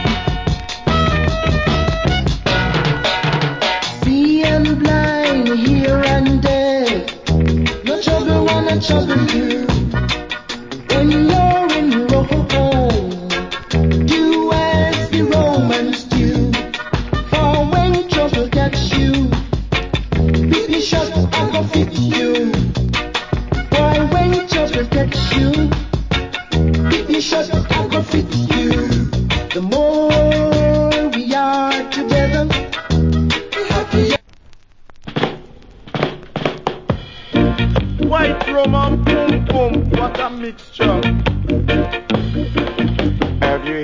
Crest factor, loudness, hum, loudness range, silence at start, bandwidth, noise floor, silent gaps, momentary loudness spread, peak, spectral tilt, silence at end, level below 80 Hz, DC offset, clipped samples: 16 dB; -16 LUFS; none; 3 LU; 0 s; 7.6 kHz; -41 dBFS; none; 7 LU; 0 dBFS; -6 dB/octave; 0 s; -24 dBFS; under 0.1%; under 0.1%